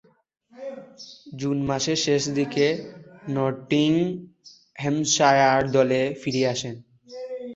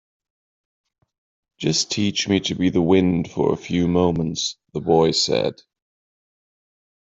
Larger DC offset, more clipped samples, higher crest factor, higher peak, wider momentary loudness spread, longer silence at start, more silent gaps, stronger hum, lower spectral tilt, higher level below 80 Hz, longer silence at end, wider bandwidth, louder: neither; neither; about the same, 20 dB vs 20 dB; about the same, -4 dBFS vs -4 dBFS; first, 22 LU vs 8 LU; second, 0.55 s vs 1.6 s; neither; neither; about the same, -4.5 dB/octave vs -5 dB/octave; second, -60 dBFS vs -54 dBFS; second, 0 s vs 1.65 s; about the same, 8 kHz vs 8.2 kHz; second, -23 LUFS vs -20 LUFS